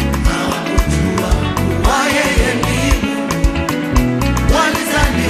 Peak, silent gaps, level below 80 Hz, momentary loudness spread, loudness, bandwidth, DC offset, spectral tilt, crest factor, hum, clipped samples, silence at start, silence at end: 0 dBFS; none; -20 dBFS; 4 LU; -15 LUFS; 15 kHz; under 0.1%; -5 dB/octave; 14 dB; none; under 0.1%; 0 s; 0 s